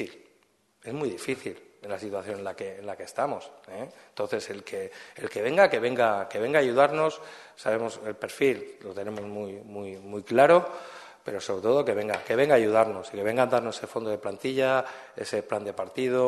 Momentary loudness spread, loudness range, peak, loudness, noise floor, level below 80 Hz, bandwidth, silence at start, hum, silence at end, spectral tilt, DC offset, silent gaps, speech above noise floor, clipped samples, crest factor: 18 LU; 10 LU; -4 dBFS; -27 LUFS; -66 dBFS; -72 dBFS; 12.5 kHz; 0 s; none; 0 s; -5 dB/octave; under 0.1%; none; 39 dB; under 0.1%; 22 dB